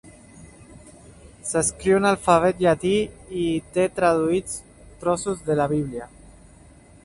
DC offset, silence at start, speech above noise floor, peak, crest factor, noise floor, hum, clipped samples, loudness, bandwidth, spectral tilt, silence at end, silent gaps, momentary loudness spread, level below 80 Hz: under 0.1%; 0.05 s; 28 dB; -2 dBFS; 22 dB; -49 dBFS; none; under 0.1%; -22 LUFS; 11.5 kHz; -5 dB/octave; 1 s; none; 14 LU; -48 dBFS